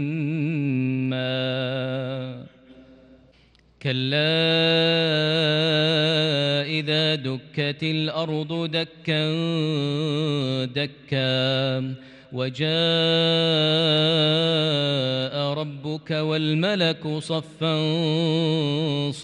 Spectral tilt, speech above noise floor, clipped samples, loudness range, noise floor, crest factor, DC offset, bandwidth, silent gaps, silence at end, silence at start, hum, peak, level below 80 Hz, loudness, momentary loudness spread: -6 dB/octave; 34 dB; under 0.1%; 5 LU; -57 dBFS; 14 dB; under 0.1%; 9.8 kHz; none; 0 s; 0 s; none; -10 dBFS; -66 dBFS; -22 LUFS; 9 LU